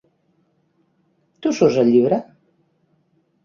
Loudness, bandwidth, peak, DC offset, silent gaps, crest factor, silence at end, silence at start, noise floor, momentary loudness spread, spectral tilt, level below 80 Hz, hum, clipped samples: -17 LUFS; 7.2 kHz; -2 dBFS; under 0.1%; none; 20 dB; 1.2 s; 1.4 s; -64 dBFS; 9 LU; -6.5 dB/octave; -64 dBFS; none; under 0.1%